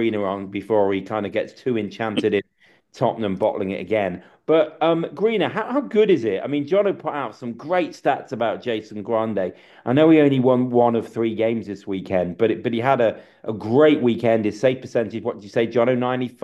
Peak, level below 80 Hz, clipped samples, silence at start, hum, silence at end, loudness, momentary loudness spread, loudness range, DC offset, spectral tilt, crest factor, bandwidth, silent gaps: -4 dBFS; -66 dBFS; under 0.1%; 0 s; none; 0.15 s; -21 LUFS; 11 LU; 4 LU; under 0.1%; -7.5 dB/octave; 16 dB; 9 kHz; none